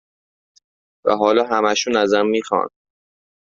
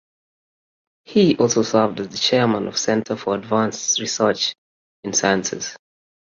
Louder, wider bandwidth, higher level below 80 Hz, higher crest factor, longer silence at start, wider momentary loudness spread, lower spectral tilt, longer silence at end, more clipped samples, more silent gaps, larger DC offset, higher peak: about the same, -18 LUFS vs -19 LUFS; about the same, 7.6 kHz vs 7.6 kHz; about the same, -62 dBFS vs -60 dBFS; about the same, 18 dB vs 18 dB; about the same, 1.05 s vs 1.1 s; about the same, 6 LU vs 7 LU; about the same, -3.5 dB/octave vs -3.5 dB/octave; first, 0.9 s vs 0.55 s; neither; second, none vs 4.58-5.03 s; neither; about the same, -2 dBFS vs -4 dBFS